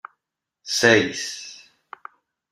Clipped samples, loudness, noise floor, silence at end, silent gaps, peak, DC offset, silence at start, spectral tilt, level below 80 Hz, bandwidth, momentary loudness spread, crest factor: under 0.1%; -19 LUFS; -83 dBFS; 0.95 s; none; -2 dBFS; under 0.1%; 0.65 s; -3 dB/octave; -64 dBFS; 15.5 kHz; 26 LU; 24 dB